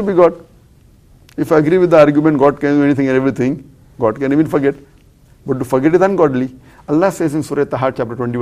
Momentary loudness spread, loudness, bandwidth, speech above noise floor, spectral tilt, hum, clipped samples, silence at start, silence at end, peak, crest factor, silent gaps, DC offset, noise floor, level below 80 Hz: 11 LU; -14 LUFS; 14.5 kHz; 33 dB; -7.5 dB/octave; none; under 0.1%; 0 s; 0 s; 0 dBFS; 14 dB; none; under 0.1%; -46 dBFS; -48 dBFS